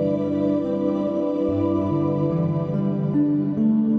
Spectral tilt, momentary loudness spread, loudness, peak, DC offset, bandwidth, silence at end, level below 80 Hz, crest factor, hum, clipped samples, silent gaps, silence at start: -11 dB/octave; 2 LU; -22 LUFS; -10 dBFS; under 0.1%; 5 kHz; 0 s; -54 dBFS; 10 dB; none; under 0.1%; none; 0 s